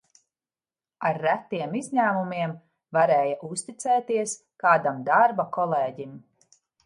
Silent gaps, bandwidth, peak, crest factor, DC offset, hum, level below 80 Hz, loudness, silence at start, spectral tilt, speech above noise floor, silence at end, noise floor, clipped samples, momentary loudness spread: none; 11.5 kHz; -6 dBFS; 20 dB; under 0.1%; none; -76 dBFS; -25 LUFS; 1 s; -5 dB/octave; over 66 dB; 0.65 s; under -90 dBFS; under 0.1%; 11 LU